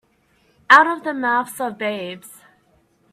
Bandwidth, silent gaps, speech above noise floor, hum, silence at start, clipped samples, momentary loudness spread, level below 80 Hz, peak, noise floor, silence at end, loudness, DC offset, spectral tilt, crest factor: 16 kHz; none; 43 dB; none; 0.7 s; under 0.1%; 18 LU; -70 dBFS; 0 dBFS; -61 dBFS; 0.85 s; -17 LUFS; under 0.1%; -3 dB/octave; 20 dB